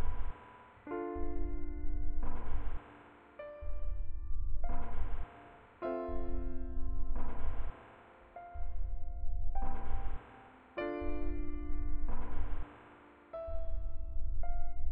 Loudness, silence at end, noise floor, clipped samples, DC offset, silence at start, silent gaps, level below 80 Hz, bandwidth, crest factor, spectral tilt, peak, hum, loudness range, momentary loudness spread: -44 LUFS; 0 s; -58 dBFS; under 0.1%; under 0.1%; 0 s; none; -36 dBFS; 3 kHz; 10 dB; -10 dB/octave; -20 dBFS; none; 2 LU; 14 LU